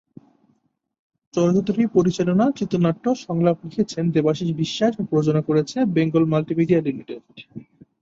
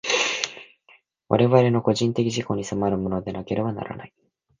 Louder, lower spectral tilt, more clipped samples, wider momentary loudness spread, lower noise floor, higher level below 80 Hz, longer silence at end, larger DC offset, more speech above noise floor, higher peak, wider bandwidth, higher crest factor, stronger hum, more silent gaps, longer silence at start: about the same, -21 LUFS vs -23 LUFS; first, -7.5 dB/octave vs -5 dB/octave; neither; second, 10 LU vs 14 LU; first, -68 dBFS vs -58 dBFS; about the same, -58 dBFS vs -54 dBFS; second, 0.4 s vs 0.55 s; neither; first, 48 dB vs 35 dB; second, -4 dBFS vs 0 dBFS; second, 7.8 kHz vs 9.6 kHz; second, 16 dB vs 22 dB; neither; neither; first, 1.35 s vs 0.05 s